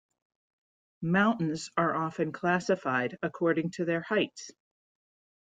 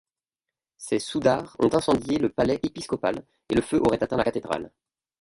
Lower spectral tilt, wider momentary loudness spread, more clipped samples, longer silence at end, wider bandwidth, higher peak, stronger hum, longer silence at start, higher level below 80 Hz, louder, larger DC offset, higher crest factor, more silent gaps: about the same, -6 dB/octave vs -5.5 dB/octave; about the same, 8 LU vs 9 LU; neither; first, 1.05 s vs 0.5 s; second, 9.2 kHz vs 11.5 kHz; second, -12 dBFS vs -8 dBFS; neither; first, 1 s vs 0.8 s; second, -72 dBFS vs -52 dBFS; second, -29 LUFS vs -25 LUFS; neither; about the same, 20 dB vs 18 dB; neither